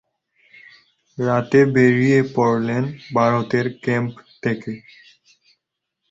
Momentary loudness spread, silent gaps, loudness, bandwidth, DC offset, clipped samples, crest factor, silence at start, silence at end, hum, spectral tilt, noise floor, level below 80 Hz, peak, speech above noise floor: 13 LU; none; -19 LUFS; 7.8 kHz; under 0.1%; under 0.1%; 18 dB; 1.2 s; 1.35 s; none; -7.5 dB/octave; -79 dBFS; -58 dBFS; -2 dBFS; 61 dB